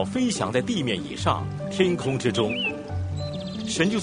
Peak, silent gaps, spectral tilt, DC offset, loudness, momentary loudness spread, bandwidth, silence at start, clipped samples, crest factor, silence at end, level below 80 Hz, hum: -4 dBFS; none; -5 dB/octave; under 0.1%; -26 LUFS; 7 LU; 10 kHz; 0 s; under 0.1%; 20 dB; 0 s; -50 dBFS; none